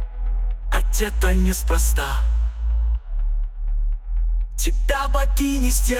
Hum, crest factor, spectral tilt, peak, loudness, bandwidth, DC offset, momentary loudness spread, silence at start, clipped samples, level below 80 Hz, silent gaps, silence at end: none; 14 dB; -4.5 dB/octave; -6 dBFS; -23 LUFS; 17 kHz; under 0.1%; 8 LU; 0 s; under 0.1%; -20 dBFS; none; 0 s